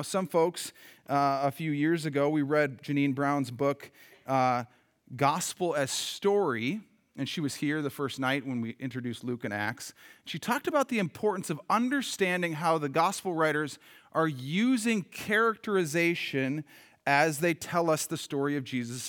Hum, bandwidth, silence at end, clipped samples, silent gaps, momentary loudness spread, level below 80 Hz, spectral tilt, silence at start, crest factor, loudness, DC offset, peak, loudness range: none; over 20 kHz; 0 s; under 0.1%; none; 9 LU; -78 dBFS; -4.5 dB/octave; 0 s; 20 dB; -29 LUFS; under 0.1%; -10 dBFS; 4 LU